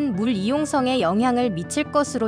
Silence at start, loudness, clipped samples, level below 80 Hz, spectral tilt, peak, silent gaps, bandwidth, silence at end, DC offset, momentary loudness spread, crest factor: 0 s; -22 LUFS; under 0.1%; -52 dBFS; -5 dB/octave; -6 dBFS; none; 10.5 kHz; 0 s; under 0.1%; 3 LU; 14 dB